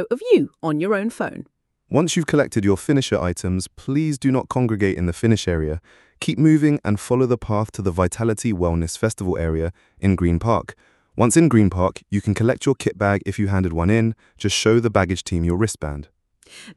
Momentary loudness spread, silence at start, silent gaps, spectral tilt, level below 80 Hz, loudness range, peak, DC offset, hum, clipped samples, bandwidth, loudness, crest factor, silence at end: 9 LU; 0 s; none; -6 dB/octave; -40 dBFS; 2 LU; -2 dBFS; under 0.1%; none; under 0.1%; 12 kHz; -20 LUFS; 18 dB; 0.05 s